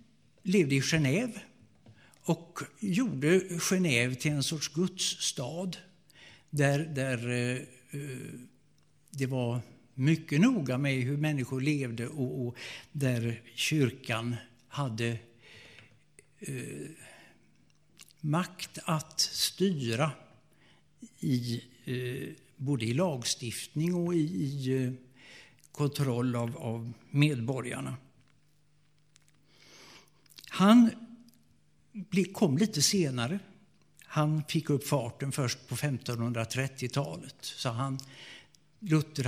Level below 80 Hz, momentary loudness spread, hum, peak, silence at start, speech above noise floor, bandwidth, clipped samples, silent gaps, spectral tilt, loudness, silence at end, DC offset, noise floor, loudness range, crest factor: -68 dBFS; 16 LU; none; -10 dBFS; 0.45 s; 39 dB; 16 kHz; under 0.1%; none; -5 dB/octave; -31 LUFS; 0 s; under 0.1%; -69 dBFS; 6 LU; 22 dB